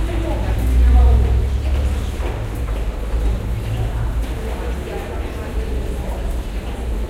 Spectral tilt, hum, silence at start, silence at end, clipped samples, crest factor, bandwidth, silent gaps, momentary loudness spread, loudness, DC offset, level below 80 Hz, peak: -7 dB/octave; none; 0 s; 0 s; under 0.1%; 16 dB; 13.5 kHz; none; 11 LU; -21 LUFS; under 0.1%; -18 dBFS; -4 dBFS